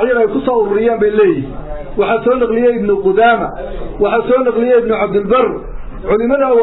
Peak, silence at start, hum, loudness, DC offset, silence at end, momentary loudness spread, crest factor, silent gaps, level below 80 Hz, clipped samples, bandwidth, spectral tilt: -2 dBFS; 0 s; none; -13 LUFS; under 0.1%; 0 s; 14 LU; 12 dB; none; -32 dBFS; under 0.1%; 4.1 kHz; -10.5 dB/octave